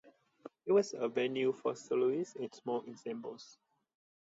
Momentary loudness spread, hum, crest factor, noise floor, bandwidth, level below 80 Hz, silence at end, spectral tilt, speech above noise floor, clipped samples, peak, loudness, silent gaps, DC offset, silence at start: 16 LU; none; 18 dB; -56 dBFS; 8 kHz; -88 dBFS; 0.7 s; -5 dB/octave; 21 dB; under 0.1%; -18 dBFS; -35 LUFS; none; under 0.1%; 0.45 s